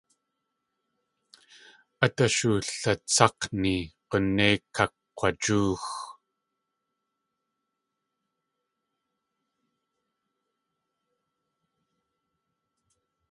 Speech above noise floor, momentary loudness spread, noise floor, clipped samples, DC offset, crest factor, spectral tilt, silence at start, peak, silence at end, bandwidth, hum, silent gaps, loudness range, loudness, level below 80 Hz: 57 dB; 10 LU; -83 dBFS; under 0.1%; under 0.1%; 30 dB; -4 dB/octave; 2 s; -2 dBFS; 7.2 s; 11.5 kHz; none; none; 9 LU; -26 LUFS; -56 dBFS